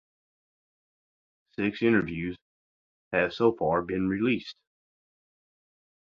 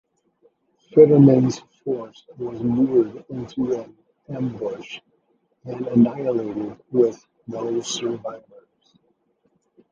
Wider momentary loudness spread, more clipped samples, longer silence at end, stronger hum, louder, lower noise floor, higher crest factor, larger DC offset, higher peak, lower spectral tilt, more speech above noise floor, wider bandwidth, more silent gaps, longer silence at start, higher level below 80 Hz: second, 14 LU vs 21 LU; neither; about the same, 1.6 s vs 1.55 s; neither; second, -27 LUFS vs -21 LUFS; first, under -90 dBFS vs -67 dBFS; about the same, 22 dB vs 20 dB; neither; second, -10 dBFS vs -2 dBFS; about the same, -8 dB/octave vs -7.5 dB/octave; first, over 63 dB vs 47 dB; second, 7 kHz vs 7.8 kHz; first, 2.41-3.11 s vs none; first, 1.6 s vs 0.95 s; about the same, -58 dBFS vs -60 dBFS